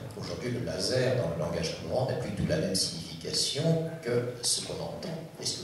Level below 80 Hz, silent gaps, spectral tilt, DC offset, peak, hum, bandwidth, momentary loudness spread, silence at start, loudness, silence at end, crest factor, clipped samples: -54 dBFS; none; -4 dB/octave; under 0.1%; -14 dBFS; none; 14.5 kHz; 9 LU; 0 s; -30 LUFS; 0 s; 18 dB; under 0.1%